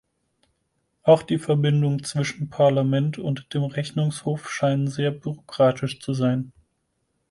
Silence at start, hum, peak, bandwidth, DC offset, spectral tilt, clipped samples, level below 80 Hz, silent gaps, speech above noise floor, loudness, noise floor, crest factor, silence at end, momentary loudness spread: 1.05 s; none; -4 dBFS; 11.5 kHz; under 0.1%; -6.5 dB/octave; under 0.1%; -62 dBFS; none; 51 dB; -23 LUFS; -73 dBFS; 20 dB; 0.8 s; 10 LU